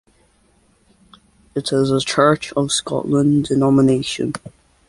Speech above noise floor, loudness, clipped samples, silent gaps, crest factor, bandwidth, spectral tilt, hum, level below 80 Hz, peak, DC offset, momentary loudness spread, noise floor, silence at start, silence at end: 41 dB; -17 LUFS; under 0.1%; none; 16 dB; 11.5 kHz; -5.5 dB/octave; none; -50 dBFS; -2 dBFS; under 0.1%; 11 LU; -57 dBFS; 1.55 s; 0.4 s